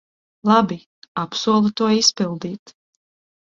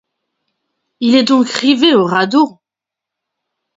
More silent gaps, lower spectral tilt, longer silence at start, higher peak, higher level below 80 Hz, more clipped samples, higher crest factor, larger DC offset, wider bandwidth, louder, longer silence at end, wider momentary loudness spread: first, 0.86-1.02 s, 1.08-1.15 s, 2.59-2.66 s vs none; about the same, -4 dB/octave vs -4.5 dB/octave; second, 0.45 s vs 1 s; about the same, -2 dBFS vs 0 dBFS; about the same, -62 dBFS vs -62 dBFS; neither; first, 20 dB vs 14 dB; neither; about the same, 7.6 kHz vs 8 kHz; second, -19 LUFS vs -12 LUFS; second, 0.9 s vs 1.3 s; first, 16 LU vs 5 LU